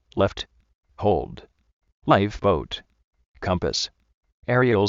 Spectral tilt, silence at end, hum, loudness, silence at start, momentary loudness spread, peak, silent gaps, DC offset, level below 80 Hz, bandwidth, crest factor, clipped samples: -4.5 dB/octave; 0 s; none; -24 LUFS; 0.15 s; 16 LU; -2 dBFS; 0.75-0.81 s, 1.73-1.81 s, 1.92-2.02 s, 3.04-3.11 s, 3.26-3.34 s, 4.14-4.21 s, 4.32-4.42 s; under 0.1%; -44 dBFS; 7.6 kHz; 22 dB; under 0.1%